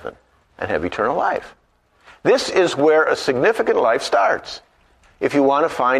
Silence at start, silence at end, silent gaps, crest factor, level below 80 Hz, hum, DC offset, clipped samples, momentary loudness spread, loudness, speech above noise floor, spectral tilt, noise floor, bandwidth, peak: 0.05 s; 0 s; none; 16 dB; -54 dBFS; none; under 0.1%; under 0.1%; 11 LU; -18 LUFS; 37 dB; -4.5 dB/octave; -55 dBFS; 13.5 kHz; -4 dBFS